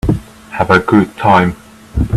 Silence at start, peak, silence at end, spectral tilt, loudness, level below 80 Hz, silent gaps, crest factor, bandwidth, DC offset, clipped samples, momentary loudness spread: 0.05 s; 0 dBFS; 0 s; -7.5 dB/octave; -13 LUFS; -28 dBFS; none; 14 dB; 13.5 kHz; under 0.1%; under 0.1%; 16 LU